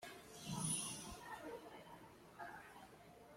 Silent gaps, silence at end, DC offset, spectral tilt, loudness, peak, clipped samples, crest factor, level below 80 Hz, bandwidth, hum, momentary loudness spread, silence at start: none; 0 s; under 0.1%; -3 dB/octave; -48 LUFS; -28 dBFS; under 0.1%; 22 dB; -72 dBFS; 16.5 kHz; none; 19 LU; 0 s